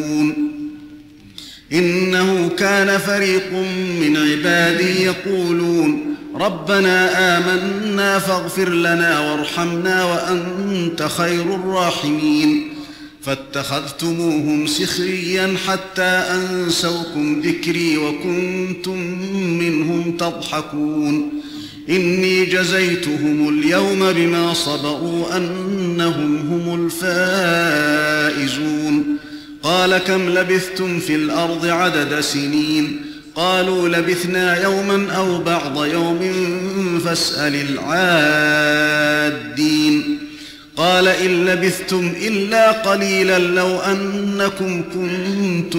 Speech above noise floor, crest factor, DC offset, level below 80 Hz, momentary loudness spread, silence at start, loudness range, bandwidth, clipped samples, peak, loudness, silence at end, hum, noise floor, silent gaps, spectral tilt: 23 dB; 12 dB; under 0.1%; -54 dBFS; 8 LU; 0 s; 4 LU; 16 kHz; under 0.1%; -4 dBFS; -17 LUFS; 0 s; none; -40 dBFS; none; -4.5 dB/octave